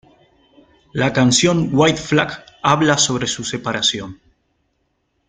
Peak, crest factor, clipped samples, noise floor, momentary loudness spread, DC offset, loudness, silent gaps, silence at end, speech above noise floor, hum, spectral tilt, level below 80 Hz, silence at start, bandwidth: -2 dBFS; 18 dB; under 0.1%; -68 dBFS; 10 LU; under 0.1%; -17 LUFS; none; 1.15 s; 51 dB; none; -3.5 dB/octave; -50 dBFS; 0.95 s; 9.6 kHz